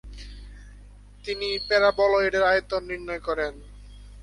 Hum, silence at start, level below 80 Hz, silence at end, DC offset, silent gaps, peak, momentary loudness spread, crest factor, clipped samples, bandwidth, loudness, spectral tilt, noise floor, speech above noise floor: 50 Hz at -45 dBFS; 0.05 s; -44 dBFS; 0 s; under 0.1%; none; -8 dBFS; 23 LU; 18 dB; under 0.1%; 11.5 kHz; -24 LUFS; -4 dB/octave; -47 dBFS; 23 dB